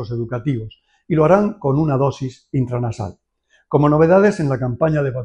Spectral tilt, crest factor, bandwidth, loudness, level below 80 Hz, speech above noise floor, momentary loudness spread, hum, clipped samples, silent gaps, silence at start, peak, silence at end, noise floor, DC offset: -8.5 dB/octave; 16 dB; 9.4 kHz; -18 LUFS; -46 dBFS; 44 dB; 13 LU; none; under 0.1%; none; 0 s; -2 dBFS; 0 s; -61 dBFS; under 0.1%